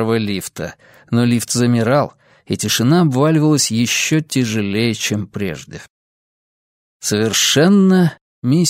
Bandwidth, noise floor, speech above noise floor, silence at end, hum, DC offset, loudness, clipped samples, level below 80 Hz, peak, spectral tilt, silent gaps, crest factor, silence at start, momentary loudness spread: 16 kHz; under -90 dBFS; over 74 dB; 0 s; none; under 0.1%; -16 LUFS; under 0.1%; -54 dBFS; -2 dBFS; -4.5 dB/octave; 5.90-7.00 s, 8.21-8.42 s; 16 dB; 0 s; 13 LU